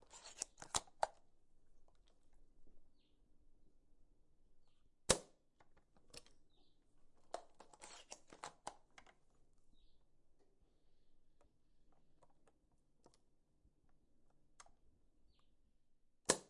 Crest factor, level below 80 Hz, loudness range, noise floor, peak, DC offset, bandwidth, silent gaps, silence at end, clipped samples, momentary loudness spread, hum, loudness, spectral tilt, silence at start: 38 dB; -70 dBFS; 14 LU; -75 dBFS; -14 dBFS; under 0.1%; 11.5 kHz; none; 0 s; under 0.1%; 23 LU; none; -44 LUFS; -1.5 dB/octave; 0 s